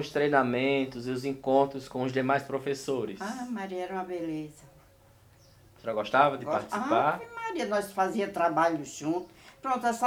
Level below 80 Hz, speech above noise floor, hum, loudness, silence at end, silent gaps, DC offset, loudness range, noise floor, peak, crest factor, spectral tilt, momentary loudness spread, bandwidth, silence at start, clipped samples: -66 dBFS; 30 dB; none; -29 LUFS; 0 s; none; under 0.1%; 8 LU; -58 dBFS; -8 dBFS; 22 dB; -5 dB/octave; 10 LU; 19 kHz; 0 s; under 0.1%